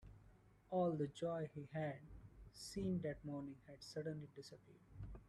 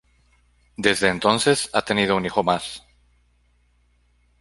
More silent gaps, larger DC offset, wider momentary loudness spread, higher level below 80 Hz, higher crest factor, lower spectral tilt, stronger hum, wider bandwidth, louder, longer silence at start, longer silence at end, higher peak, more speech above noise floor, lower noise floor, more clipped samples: neither; neither; first, 20 LU vs 13 LU; second, -66 dBFS vs -54 dBFS; about the same, 18 dB vs 22 dB; first, -6.5 dB/octave vs -3.5 dB/octave; second, none vs 60 Hz at -50 dBFS; about the same, 13 kHz vs 12 kHz; second, -46 LUFS vs -20 LUFS; second, 0 s vs 0.8 s; second, 0 s vs 1.6 s; second, -30 dBFS vs -2 dBFS; second, 23 dB vs 41 dB; first, -68 dBFS vs -62 dBFS; neither